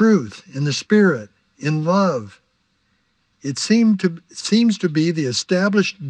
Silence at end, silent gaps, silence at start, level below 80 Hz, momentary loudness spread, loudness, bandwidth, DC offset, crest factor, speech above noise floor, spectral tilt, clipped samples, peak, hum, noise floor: 0 s; none; 0 s; -70 dBFS; 12 LU; -19 LUFS; 9.8 kHz; under 0.1%; 16 dB; 48 dB; -5.5 dB/octave; under 0.1%; -4 dBFS; none; -66 dBFS